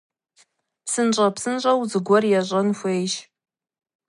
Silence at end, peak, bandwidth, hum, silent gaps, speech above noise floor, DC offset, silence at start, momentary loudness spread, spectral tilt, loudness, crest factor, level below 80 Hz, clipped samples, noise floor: 0.85 s; -6 dBFS; 11.5 kHz; none; none; 41 dB; under 0.1%; 0.85 s; 9 LU; -4.5 dB/octave; -21 LUFS; 18 dB; -72 dBFS; under 0.1%; -61 dBFS